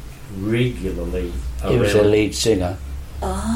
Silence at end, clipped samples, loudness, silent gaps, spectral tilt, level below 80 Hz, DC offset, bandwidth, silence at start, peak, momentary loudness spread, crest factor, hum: 0 s; under 0.1%; -20 LUFS; none; -5.5 dB/octave; -30 dBFS; under 0.1%; 16.5 kHz; 0 s; -4 dBFS; 13 LU; 16 dB; none